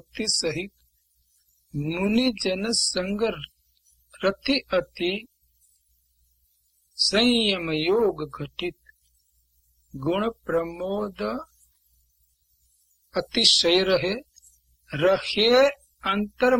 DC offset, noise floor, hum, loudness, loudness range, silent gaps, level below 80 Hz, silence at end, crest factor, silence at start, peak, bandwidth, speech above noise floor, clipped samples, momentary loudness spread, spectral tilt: under 0.1%; -67 dBFS; none; -23 LUFS; 10 LU; none; -54 dBFS; 0 s; 24 dB; 0.15 s; -2 dBFS; 16.5 kHz; 44 dB; under 0.1%; 15 LU; -3.5 dB/octave